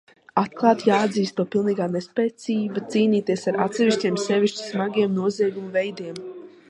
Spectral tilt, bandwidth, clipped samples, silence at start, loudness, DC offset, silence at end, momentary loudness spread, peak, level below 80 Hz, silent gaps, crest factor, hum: -5.5 dB/octave; 10.5 kHz; under 0.1%; 0.35 s; -23 LUFS; under 0.1%; 0.2 s; 7 LU; -4 dBFS; -72 dBFS; none; 20 dB; none